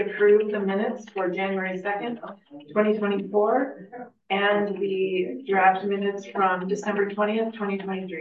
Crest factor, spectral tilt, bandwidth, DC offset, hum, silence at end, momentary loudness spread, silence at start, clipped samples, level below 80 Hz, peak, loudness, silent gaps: 16 dB; -6.5 dB/octave; 7.4 kHz; under 0.1%; none; 0 s; 11 LU; 0 s; under 0.1%; -76 dBFS; -8 dBFS; -25 LUFS; none